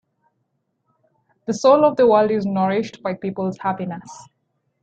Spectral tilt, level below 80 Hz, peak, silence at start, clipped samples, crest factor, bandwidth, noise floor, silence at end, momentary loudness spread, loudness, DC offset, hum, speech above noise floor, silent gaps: -6.5 dB/octave; -64 dBFS; -2 dBFS; 1.5 s; under 0.1%; 20 dB; 8.6 kHz; -72 dBFS; 0.6 s; 14 LU; -19 LUFS; under 0.1%; none; 53 dB; none